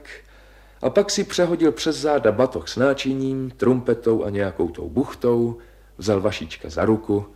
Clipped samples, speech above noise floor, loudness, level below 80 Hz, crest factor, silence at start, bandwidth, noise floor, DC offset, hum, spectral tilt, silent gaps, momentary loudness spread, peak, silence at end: under 0.1%; 27 dB; -22 LUFS; -46 dBFS; 18 dB; 0.05 s; 14.5 kHz; -48 dBFS; under 0.1%; 50 Hz at -50 dBFS; -5.5 dB/octave; none; 7 LU; -4 dBFS; 0.05 s